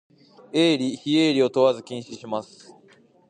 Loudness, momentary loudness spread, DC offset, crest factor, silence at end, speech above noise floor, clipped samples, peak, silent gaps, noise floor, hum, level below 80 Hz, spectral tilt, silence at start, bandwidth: -22 LUFS; 13 LU; under 0.1%; 18 dB; 0.85 s; 33 dB; under 0.1%; -6 dBFS; none; -56 dBFS; none; -76 dBFS; -5 dB/octave; 0.55 s; 9.8 kHz